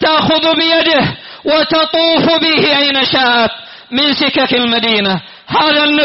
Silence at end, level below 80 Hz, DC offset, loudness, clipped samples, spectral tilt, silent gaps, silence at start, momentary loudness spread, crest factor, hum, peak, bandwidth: 0 s; -48 dBFS; under 0.1%; -11 LUFS; under 0.1%; -1 dB/octave; none; 0 s; 7 LU; 10 dB; none; -2 dBFS; 6 kHz